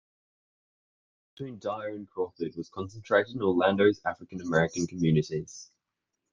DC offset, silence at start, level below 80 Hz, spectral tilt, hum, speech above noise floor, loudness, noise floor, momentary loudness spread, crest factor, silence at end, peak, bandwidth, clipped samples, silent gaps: under 0.1%; 1.4 s; -64 dBFS; -6 dB/octave; none; 56 dB; -29 LUFS; -85 dBFS; 14 LU; 20 dB; 0.7 s; -10 dBFS; 7.6 kHz; under 0.1%; none